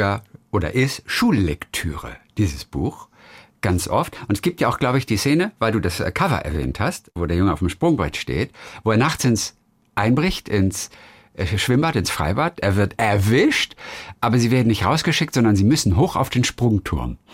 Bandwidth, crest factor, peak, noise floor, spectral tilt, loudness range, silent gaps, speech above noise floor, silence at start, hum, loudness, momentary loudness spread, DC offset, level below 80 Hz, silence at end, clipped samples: 16 kHz; 16 dB; -4 dBFS; -47 dBFS; -5.5 dB/octave; 5 LU; none; 28 dB; 0 s; none; -20 LUFS; 10 LU; under 0.1%; -40 dBFS; 0.2 s; under 0.1%